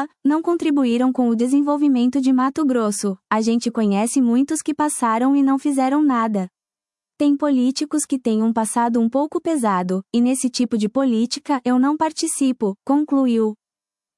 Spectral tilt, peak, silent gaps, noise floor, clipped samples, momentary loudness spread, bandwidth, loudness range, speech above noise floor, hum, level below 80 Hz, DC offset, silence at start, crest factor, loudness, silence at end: -5 dB/octave; -4 dBFS; none; under -90 dBFS; under 0.1%; 4 LU; 12 kHz; 2 LU; over 72 dB; none; -70 dBFS; under 0.1%; 0 s; 14 dB; -19 LUFS; 0.65 s